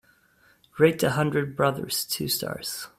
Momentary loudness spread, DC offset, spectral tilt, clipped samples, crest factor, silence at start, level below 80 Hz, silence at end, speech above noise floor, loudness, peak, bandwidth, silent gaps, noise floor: 9 LU; under 0.1%; -4.5 dB/octave; under 0.1%; 20 dB; 0.75 s; -60 dBFS; 0.1 s; 36 dB; -25 LUFS; -6 dBFS; 16 kHz; none; -61 dBFS